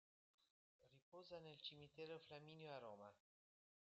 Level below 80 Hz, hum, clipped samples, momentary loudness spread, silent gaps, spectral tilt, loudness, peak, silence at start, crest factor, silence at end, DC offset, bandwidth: under -90 dBFS; none; under 0.1%; 8 LU; 0.50-0.79 s, 1.02-1.12 s; -3 dB/octave; -59 LUFS; -42 dBFS; 0.4 s; 20 dB; 0.8 s; under 0.1%; 7.6 kHz